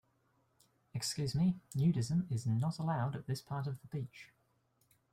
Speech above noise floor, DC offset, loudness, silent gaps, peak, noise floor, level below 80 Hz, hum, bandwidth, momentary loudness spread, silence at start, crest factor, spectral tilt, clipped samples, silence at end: 40 dB; under 0.1%; -36 LUFS; none; -22 dBFS; -76 dBFS; -66 dBFS; none; 15.5 kHz; 11 LU; 0.95 s; 16 dB; -6 dB/octave; under 0.1%; 0.85 s